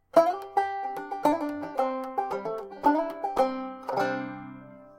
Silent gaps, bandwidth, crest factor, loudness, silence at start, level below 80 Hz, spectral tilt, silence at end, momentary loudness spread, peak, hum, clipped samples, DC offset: none; 16.5 kHz; 22 dB; -29 LUFS; 0.15 s; -64 dBFS; -5.5 dB/octave; 0.05 s; 10 LU; -6 dBFS; none; under 0.1%; under 0.1%